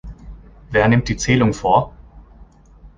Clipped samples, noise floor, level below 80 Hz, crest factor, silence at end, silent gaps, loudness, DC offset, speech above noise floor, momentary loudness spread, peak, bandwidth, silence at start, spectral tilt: under 0.1%; -45 dBFS; -36 dBFS; 18 dB; 0.1 s; none; -17 LUFS; under 0.1%; 29 dB; 11 LU; -2 dBFS; 9.6 kHz; 0.05 s; -6 dB/octave